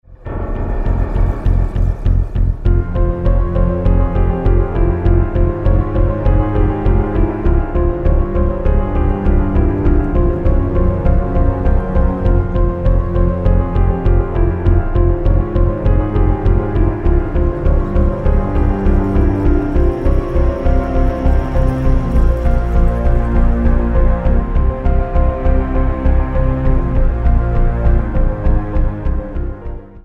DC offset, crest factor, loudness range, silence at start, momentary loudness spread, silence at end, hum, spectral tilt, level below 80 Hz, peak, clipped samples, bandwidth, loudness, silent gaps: under 0.1%; 12 dB; 1 LU; 0.1 s; 3 LU; 0.05 s; none; -10.5 dB/octave; -14 dBFS; 0 dBFS; under 0.1%; 3.6 kHz; -16 LUFS; none